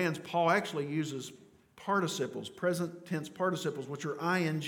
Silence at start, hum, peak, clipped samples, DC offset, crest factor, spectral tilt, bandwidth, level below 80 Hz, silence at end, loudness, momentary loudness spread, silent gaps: 0 s; none; -14 dBFS; under 0.1%; under 0.1%; 20 dB; -5 dB/octave; 18 kHz; -80 dBFS; 0 s; -33 LUFS; 10 LU; none